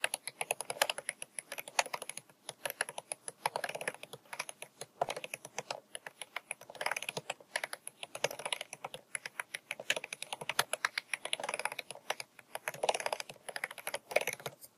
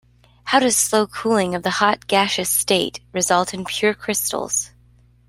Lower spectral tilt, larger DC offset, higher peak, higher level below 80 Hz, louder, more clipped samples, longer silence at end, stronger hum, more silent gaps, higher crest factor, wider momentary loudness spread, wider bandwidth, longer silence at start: second, 0 dB/octave vs -2.5 dB/octave; neither; second, -10 dBFS vs -2 dBFS; second, -86 dBFS vs -54 dBFS; second, -39 LUFS vs -19 LUFS; neither; second, 0.1 s vs 0.6 s; second, none vs 60 Hz at -50 dBFS; neither; first, 32 dB vs 18 dB; first, 10 LU vs 7 LU; about the same, 15.5 kHz vs 16 kHz; second, 0 s vs 0.45 s